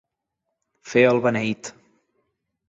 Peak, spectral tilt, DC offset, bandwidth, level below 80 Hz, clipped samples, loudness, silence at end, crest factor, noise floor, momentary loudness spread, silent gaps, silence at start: -4 dBFS; -5.5 dB/octave; under 0.1%; 8 kHz; -64 dBFS; under 0.1%; -20 LUFS; 1 s; 20 dB; -80 dBFS; 15 LU; none; 0.85 s